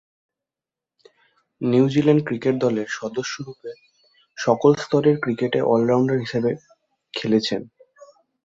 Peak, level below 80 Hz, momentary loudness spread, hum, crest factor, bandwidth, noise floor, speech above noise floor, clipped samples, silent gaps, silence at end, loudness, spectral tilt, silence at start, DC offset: -2 dBFS; -62 dBFS; 15 LU; none; 20 dB; 7.8 kHz; -89 dBFS; 69 dB; under 0.1%; none; 0.8 s; -21 LUFS; -6.5 dB/octave; 1.6 s; under 0.1%